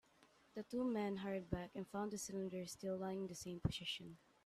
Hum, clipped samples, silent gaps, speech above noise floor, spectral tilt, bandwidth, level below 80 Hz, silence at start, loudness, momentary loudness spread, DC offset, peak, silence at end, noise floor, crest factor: none; under 0.1%; none; 27 dB; -5 dB/octave; 14.5 kHz; -64 dBFS; 0.2 s; -45 LUFS; 7 LU; under 0.1%; -24 dBFS; 0.3 s; -72 dBFS; 22 dB